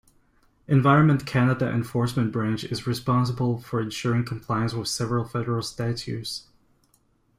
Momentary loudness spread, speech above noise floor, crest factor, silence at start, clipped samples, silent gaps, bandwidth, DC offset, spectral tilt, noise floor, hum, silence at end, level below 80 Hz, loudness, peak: 10 LU; 41 dB; 20 dB; 0.7 s; under 0.1%; none; 15.5 kHz; under 0.1%; -6.5 dB/octave; -65 dBFS; none; 0.95 s; -52 dBFS; -25 LUFS; -4 dBFS